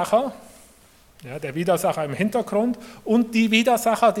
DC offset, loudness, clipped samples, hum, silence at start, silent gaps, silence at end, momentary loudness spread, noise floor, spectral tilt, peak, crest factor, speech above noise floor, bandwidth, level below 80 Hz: under 0.1%; -22 LUFS; under 0.1%; none; 0 s; none; 0 s; 13 LU; -53 dBFS; -5 dB/octave; -4 dBFS; 18 dB; 32 dB; 16.5 kHz; -58 dBFS